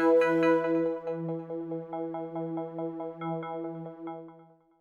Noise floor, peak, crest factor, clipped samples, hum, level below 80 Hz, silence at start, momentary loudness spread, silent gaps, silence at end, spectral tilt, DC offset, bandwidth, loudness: -56 dBFS; -14 dBFS; 18 dB; under 0.1%; none; -80 dBFS; 0 s; 16 LU; none; 0.35 s; -8 dB/octave; under 0.1%; 7 kHz; -31 LUFS